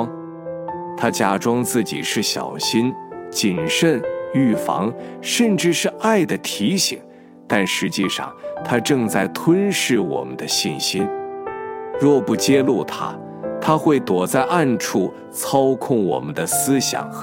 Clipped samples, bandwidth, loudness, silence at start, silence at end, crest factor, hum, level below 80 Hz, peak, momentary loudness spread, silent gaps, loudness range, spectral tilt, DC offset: under 0.1%; 17 kHz; -20 LUFS; 0 s; 0 s; 18 dB; none; -62 dBFS; -2 dBFS; 12 LU; none; 2 LU; -4 dB/octave; under 0.1%